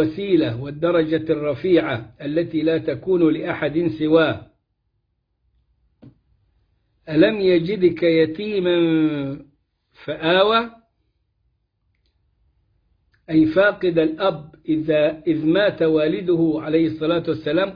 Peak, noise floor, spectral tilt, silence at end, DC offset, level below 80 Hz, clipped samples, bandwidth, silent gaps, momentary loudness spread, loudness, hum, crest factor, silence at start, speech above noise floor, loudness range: -4 dBFS; -71 dBFS; -9 dB/octave; 0 s; under 0.1%; -56 dBFS; under 0.1%; 5.2 kHz; none; 8 LU; -19 LUFS; none; 18 dB; 0 s; 52 dB; 5 LU